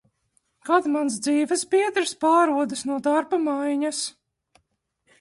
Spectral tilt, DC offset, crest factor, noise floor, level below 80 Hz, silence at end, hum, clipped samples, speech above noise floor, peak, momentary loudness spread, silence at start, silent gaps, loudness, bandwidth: -2.5 dB/octave; under 0.1%; 18 dB; -73 dBFS; -72 dBFS; 1.1 s; none; under 0.1%; 50 dB; -6 dBFS; 7 LU; 0.65 s; none; -23 LUFS; 11.5 kHz